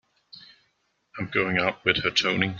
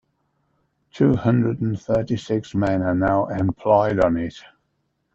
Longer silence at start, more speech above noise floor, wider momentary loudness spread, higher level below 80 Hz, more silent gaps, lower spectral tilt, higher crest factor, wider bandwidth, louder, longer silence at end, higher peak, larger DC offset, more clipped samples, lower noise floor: second, 0.35 s vs 0.95 s; second, 47 dB vs 51 dB; first, 12 LU vs 7 LU; second, -58 dBFS vs -46 dBFS; neither; second, -4 dB/octave vs -8.5 dB/octave; first, 24 dB vs 18 dB; about the same, 7.4 kHz vs 7.8 kHz; about the same, -23 LUFS vs -21 LUFS; second, 0 s vs 0.75 s; about the same, -4 dBFS vs -4 dBFS; neither; neither; about the same, -72 dBFS vs -71 dBFS